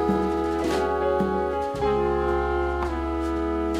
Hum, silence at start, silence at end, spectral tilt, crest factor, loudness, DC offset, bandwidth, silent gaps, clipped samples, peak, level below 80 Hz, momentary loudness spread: none; 0 s; 0 s; -7 dB/octave; 12 dB; -25 LUFS; under 0.1%; 14 kHz; none; under 0.1%; -12 dBFS; -36 dBFS; 3 LU